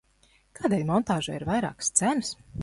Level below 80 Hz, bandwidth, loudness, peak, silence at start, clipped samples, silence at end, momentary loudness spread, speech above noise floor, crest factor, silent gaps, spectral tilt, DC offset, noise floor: -54 dBFS; 11.5 kHz; -27 LUFS; -4 dBFS; 0.6 s; under 0.1%; 0 s; 7 LU; 36 dB; 22 dB; none; -4 dB/octave; under 0.1%; -63 dBFS